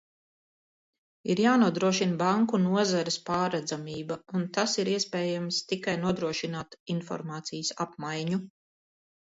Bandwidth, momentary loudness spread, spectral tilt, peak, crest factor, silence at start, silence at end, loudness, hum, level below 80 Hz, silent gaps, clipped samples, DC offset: 8 kHz; 11 LU; -4.5 dB/octave; -10 dBFS; 18 dB; 1.25 s; 0.85 s; -29 LUFS; none; -70 dBFS; 6.80-6.86 s; under 0.1%; under 0.1%